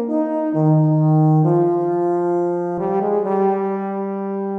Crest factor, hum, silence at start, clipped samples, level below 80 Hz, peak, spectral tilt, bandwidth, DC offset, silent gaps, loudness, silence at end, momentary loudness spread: 12 dB; none; 0 s; under 0.1%; -64 dBFS; -6 dBFS; -12 dB/octave; 2.9 kHz; under 0.1%; none; -18 LUFS; 0 s; 8 LU